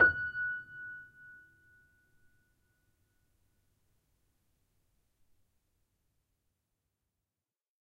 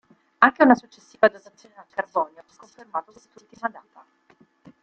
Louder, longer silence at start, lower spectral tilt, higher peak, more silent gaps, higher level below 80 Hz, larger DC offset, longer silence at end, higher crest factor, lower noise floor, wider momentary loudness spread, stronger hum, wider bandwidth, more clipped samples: second, -34 LUFS vs -22 LUFS; second, 0 s vs 0.4 s; about the same, -6 dB/octave vs -5.5 dB/octave; second, -12 dBFS vs -2 dBFS; neither; about the same, -68 dBFS vs -70 dBFS; neither; first, 6.55 s vs 1.15 s; about the same, 28 dB vs 24 dB; first, under -90 dBFS vs -59 dBFS; first, 23 LU vs 16 LU; neither; second, 4.7 kHz vs 7 kHz; neither